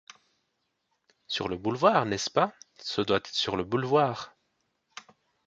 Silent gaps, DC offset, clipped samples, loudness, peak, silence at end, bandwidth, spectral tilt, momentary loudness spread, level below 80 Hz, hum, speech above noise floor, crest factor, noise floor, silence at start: none; under 0.1%; under 0.1%; -27 LUFS; -8 dBFS; 1.2 s; 9 kHz; -4.5 dB/octave; 23 LU; -62 dBFS; none; 51 dB; 22 dB; -78 dBFS; 1.3 s